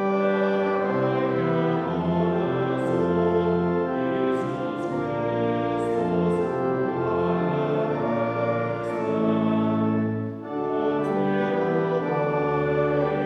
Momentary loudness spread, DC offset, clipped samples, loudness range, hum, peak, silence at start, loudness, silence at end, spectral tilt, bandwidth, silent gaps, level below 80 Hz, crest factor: 4 LU; under 0.1%; under 0.1%; 1 LU; none; -10 dBFS; 0 s; -24 LUFS; 0 s; -9 dB/octave; 9 kHz; none; -56 dBFS; 12 dB